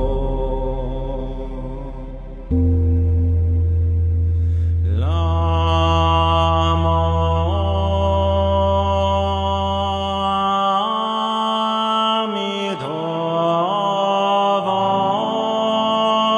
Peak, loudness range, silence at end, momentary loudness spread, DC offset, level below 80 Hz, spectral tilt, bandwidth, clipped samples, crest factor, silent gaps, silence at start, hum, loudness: -4 dBFS; 3 LU; 0 s; 8 LU; under 0.1%; -26 dBFS; -7 dB/octave; 7.2 kHz; under 0.1%; 14 dB; none; 0 s; none; -19 LUFS